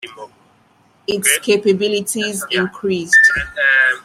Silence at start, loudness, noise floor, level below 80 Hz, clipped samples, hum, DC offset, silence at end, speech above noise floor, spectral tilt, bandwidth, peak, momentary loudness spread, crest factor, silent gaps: 0 s; -14 LUFS; -54 dBFS; -48 dBFS; under 0.1%; none; under 0.1%; 0.05 s; 39 dB; -2.5 dB/octave; 16 kHz; 0 dBFS; 11 LU; 16 dB; none